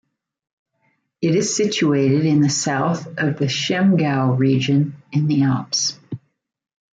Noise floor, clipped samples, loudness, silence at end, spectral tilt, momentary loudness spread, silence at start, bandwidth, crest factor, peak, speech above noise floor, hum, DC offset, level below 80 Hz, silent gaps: -67 dBFS; under 0.1%; -19 LUFS; 0.8 s; -5 dB/octave; 6 LU; 1.2 s; 9.4 kHz; 14 dB; -6 dBFS; 49 dB; none; under 0.1%; -62 dBFS; none